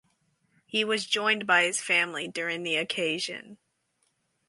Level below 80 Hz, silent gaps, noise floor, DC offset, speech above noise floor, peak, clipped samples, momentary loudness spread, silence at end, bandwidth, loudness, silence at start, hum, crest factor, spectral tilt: -80 dBFS; none; -74 dBFS; under 0.1%; 46 dB; -8 dBFS; under 0.1%; 9 LU; 0.95 s; 11.5 kHz; -26 LUFS; 0.75 s; none; 22 dB; -2 dB/octave